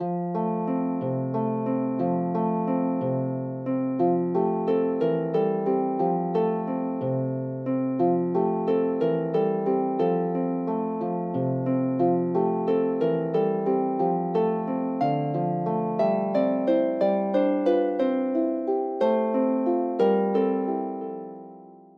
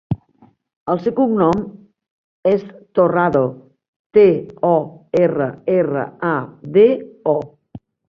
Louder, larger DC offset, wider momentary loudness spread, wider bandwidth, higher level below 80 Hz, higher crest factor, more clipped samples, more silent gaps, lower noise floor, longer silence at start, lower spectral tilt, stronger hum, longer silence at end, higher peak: second, -25 LUFS vs -17 LUFS; neither; second, 5 LU vs 10 LU; second, 5.2 kHz vs 6.8 kHz; second, -76 dBFS vs -52 dBFS; about the same, 14 dB vs 16 dB; neither; second, none vs 0.76-0.86 s, 2.11-2.43 s, 3.88-4.10 s; second, -47 dBFS vs -53 dBFS; about the same, 0 s vs 0.1 s; first, -10.5 dB/octave vs -9 dB/octave; neither; about the same, 0.2 s vs 0.3 s; second, -10 dBFS vs -2 dBFS